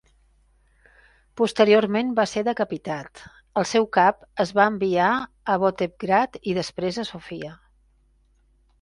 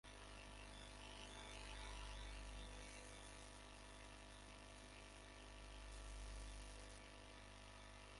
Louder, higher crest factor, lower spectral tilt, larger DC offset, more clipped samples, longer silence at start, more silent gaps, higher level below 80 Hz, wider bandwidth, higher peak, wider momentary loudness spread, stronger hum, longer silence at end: first, -22 LUFS vs -58 LUFS; about the same, 20 dB vs 18 dB; first, -5 dB/octave vs -3 dB/octave; neither; neither; first, 1.35 s vs 0.05 s; neither; about the same, -58 dBFS vs -60 dBFS; about the same, 11.5 kHz vs 11.5 kHz; first, -4 dBFS vs -40 dBFS; first, 14 LU vs 5 LU; second, none vs 50 Hz at -60 dBFS; first, 1.25 s vs 0 s